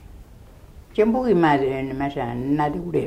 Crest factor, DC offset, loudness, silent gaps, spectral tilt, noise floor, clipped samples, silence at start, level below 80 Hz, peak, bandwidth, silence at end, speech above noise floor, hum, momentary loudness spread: 16 dB; under 0.1%; -22 LUFS; none; -8 dB/octave; -45 dBFS; under 0.1%; 0 s; -44 dBFS; -6 dBFS; 15 kHz; 0 s; 24 dB; none; 9 LU